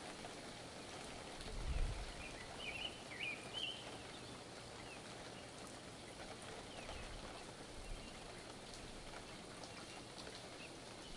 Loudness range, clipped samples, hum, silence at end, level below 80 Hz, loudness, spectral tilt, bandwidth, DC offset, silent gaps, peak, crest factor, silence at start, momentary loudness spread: 5 LU; under 0.1%; none; 0 s; -54 dBFS; -50 LUFS; -3 dB/octave; 11.5 kHz; under 0.1%; none; -30 dBFS; 20 dB; 0 s; 8 LU